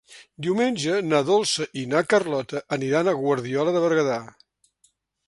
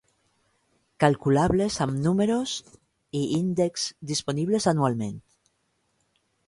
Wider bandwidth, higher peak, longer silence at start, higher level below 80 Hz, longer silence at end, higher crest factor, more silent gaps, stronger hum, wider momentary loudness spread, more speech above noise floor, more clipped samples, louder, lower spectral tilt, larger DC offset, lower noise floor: about the same, 11.5 kHz vs 11.5 kHz; about the same, -6 dBFS vs -6 dBFS; second, 0.1 s vs 1 s; second, -68 dBFS vs -52 dBFS; second, 1 s vs 1.25 s; about the same, 18 dB vs 20 dB; neither; neither; second, 7 LU vs 10 LU; second, 43 dB vs 48 dB; neither; about the same, -23 LUFS vs -25 LUFS; about the same, -4.5 dB/octave vs -5.5 dB/octave; neither; second, -66 dBFS vs -72 dBFS